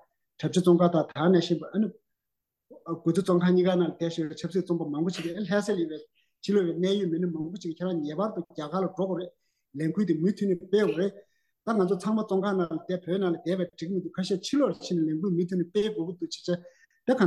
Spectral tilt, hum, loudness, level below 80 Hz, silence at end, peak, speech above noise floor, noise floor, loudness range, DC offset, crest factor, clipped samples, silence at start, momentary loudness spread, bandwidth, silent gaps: -7 dB/octave; none; -28 LUFS; -74 dBFS; 0 s; -10 dBFS; 59 dB; -86 dBFS; 3 LU; under 0.1%; 18 dB; under 0.1%; 0.4 s; 11 LU; 12 kHz; none